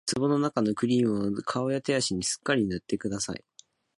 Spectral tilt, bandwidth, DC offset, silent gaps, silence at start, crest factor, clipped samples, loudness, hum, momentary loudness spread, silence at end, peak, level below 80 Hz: -4.5 dB/octave; 11.5 kHz; under 0.1%; none; 0.05 s; 16 dB; under 0.1%; -28 LUFS; none; 7 LU; 0.6 s; -12 dBFS; -58 dBFS